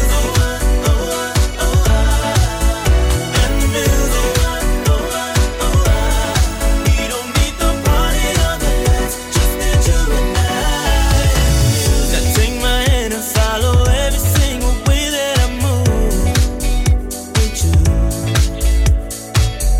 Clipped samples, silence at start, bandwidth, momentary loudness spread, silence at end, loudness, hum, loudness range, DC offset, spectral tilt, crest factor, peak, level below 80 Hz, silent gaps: under 0.1%; 0 s; 16.5 kHz; 4 LU; 0 s; -16 LUFS; none; 1 LU; under 0.1%; -4.5 dB/octave; 10 dB; -4 dBFS; -16 dBFS; none